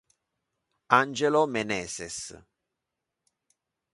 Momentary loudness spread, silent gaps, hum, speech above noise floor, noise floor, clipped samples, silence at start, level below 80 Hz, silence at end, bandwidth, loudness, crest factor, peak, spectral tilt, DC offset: 14 LU; none; none; 59 dB; -85 dBFS; under 0.1%; 0.9 s; -66 dBFS; 1.6 s; 11.5 kHz; -26 LUFS; 28 dB; -2 dBFS; -3.5 dB/octave; under 0.1%